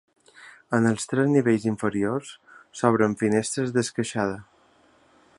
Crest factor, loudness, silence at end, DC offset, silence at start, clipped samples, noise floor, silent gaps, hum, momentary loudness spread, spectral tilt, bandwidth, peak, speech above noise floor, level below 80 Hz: 22 dB; -24 LUFS; 0.95 s; under 0.1%; 0.4 s; under 0.1%; -59 dBFS; none; none; 9 LU; -5.5 dB/octave; 11.5 kHz; -4 dBFS; 36 dB; -62 dBFS